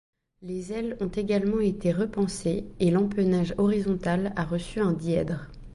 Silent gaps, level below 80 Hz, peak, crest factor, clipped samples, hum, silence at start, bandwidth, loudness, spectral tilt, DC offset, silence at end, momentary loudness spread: none; -46 dBFS; -12 dBFS; 14 dB; under 0.1%; none; 0.4 s; 11.5 kHz; -27 LUFS; -7 dB/octave; under 0.1%; 0 s; 8 LU